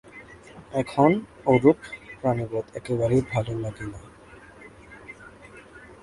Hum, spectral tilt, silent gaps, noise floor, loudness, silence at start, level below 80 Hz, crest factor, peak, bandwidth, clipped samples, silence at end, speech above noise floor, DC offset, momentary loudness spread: none; -8 dB/octave; none; -48 dBFS; -24 LUFS; 0.15 s; -52 dBFS; 22 dB; -4 dBFS; 11.5 kHz; under 0.1%; 0.1 s; 25 dB; under 0.1%; 26 LU